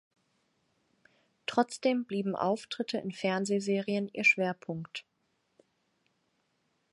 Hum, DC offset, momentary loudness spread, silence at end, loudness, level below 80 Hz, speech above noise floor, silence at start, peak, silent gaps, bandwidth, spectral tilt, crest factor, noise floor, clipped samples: none; under 0.1%; 14 LU; 1.9 s; -31 LUFS; -80 dBFS; 46 dB; 1.5 s; -10 dBFS; none; 11.5 kHz; -5 dB/octave; 22 dB; -77 dBFS; under 0.1%